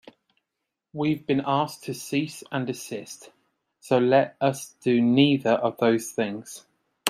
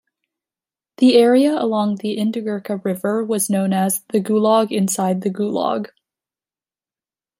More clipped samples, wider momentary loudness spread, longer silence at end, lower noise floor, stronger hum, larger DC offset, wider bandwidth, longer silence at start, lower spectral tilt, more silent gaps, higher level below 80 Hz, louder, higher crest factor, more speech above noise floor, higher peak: neither; first, 17 LU vs 10 LU; second, 0 s vs 1.55 s; second, -83 dBFS vs under -90 dBFS; neither; neither; about the same, 15.5 kHz vs 16 kHz; about the same, 0.95 s vs 1 s; about the same, -5.5 dB/octave vs -5 dB/octave; neither; about the same, -70 dBFS vs -70 dBFS; second, -24 LUFS vs -18 LUFS; first, 24 dB vs 16 dB; second, 59 dB vs over 73 dB; about the same, 0 dBFS vs -2 dBFS